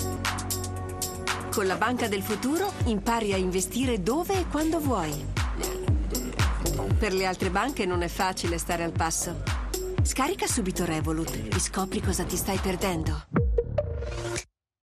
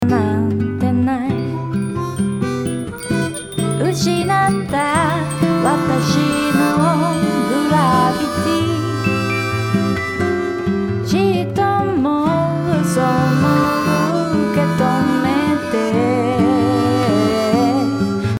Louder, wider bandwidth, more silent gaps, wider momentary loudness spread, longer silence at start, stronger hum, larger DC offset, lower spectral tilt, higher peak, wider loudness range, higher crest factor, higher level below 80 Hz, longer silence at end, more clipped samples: second, -28 LUFS vs -17 LUFS; second, 14 kHz vs 18.5 kHz; neither; about the same, 5 LU vs 6 LU; about the same, 0 s vs 0 s; neither; neither; second, -4.5 dB/octave vs -6 dB/octave; second, -12 dBFS vs -2 dBFS; about the same, 1 LU vs 3 LU; about the same, 16 dB vs 14 dB; first, -36 dBFS vs -48 dBFS; first, 0.4 s vs 0 s; neither